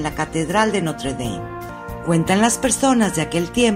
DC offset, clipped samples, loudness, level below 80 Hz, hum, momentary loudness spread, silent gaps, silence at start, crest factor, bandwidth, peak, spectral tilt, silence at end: under 0.1%; under 0.1%; -19 LUFS; -40 dBFS; none; 13 LU; none; 0 s; 18 dB; 16 kHz; -2 dBFS; -4.5 dB/octave; 0 s